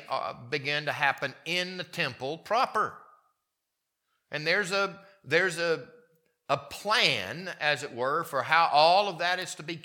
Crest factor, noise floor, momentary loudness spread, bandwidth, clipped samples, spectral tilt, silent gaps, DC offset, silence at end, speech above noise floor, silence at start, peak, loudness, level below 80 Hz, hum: 24 dB; -84 dBFS; 11 LU; 19 kHz; under 0.1%; -3 dB/octave; none; under 0.1%; 0.05 s; 55 dB; 0 s; -6 dBFS; -28 LUFS; -76 dBFS; none